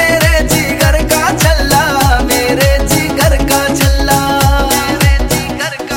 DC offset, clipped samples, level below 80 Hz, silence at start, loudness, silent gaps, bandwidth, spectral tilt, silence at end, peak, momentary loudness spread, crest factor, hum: under 0.1%; under 0.1%; -16 dBFS; 0 s; -11 LUFS; none; 17.5 kHz; -4 dB/octave; 0 s; 0 dBFS; 3 LU; 10 dB; none